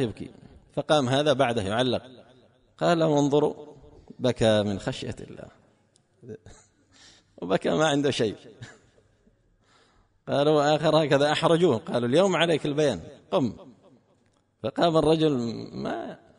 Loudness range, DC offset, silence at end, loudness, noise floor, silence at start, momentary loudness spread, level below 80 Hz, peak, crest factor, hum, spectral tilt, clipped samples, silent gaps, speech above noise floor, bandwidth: 7 LU; under 0.1%; 0.2 s; -24 LUFS; -66 dBFS; 0 s; 20 LU; -56 dBFS; -8 dBFS; 18 dB; none; -5.5 dB/octave; under 0.1%; none; 42 dB; 10.5 kHz